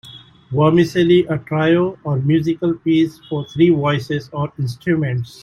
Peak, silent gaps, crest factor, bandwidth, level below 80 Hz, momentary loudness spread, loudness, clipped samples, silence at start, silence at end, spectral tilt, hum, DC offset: -2 dBFS; none; 14 dB; 12.5 kHz; -52 dBFS; 10 LU; -17 LUFS; under 0.1%; 0.05 s; 0.15 s; -8 dB/octave; none; under 0.1%